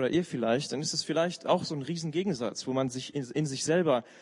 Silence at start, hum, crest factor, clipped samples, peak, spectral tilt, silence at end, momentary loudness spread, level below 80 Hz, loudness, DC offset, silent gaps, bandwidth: 0 s; none; 18 dB; under 0.1%; -12 dBFS; -4.5 dB/octave; 0 s; 6 LU; -72 dBFS; -30 LUFS; under 0.1%; none; 11 kHz